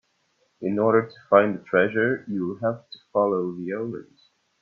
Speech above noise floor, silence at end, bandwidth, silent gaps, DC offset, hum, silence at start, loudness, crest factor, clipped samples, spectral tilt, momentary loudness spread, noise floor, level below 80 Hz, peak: 45 dB; 0.6 s; 5.8 kHz; none; under 0.1%; none; 0.6 s; -24 LUFS; 22 dB; under 0.1%; -9 dB/octave; 12 LU; -69 dBFS; -68 dBFS; -2 dBFS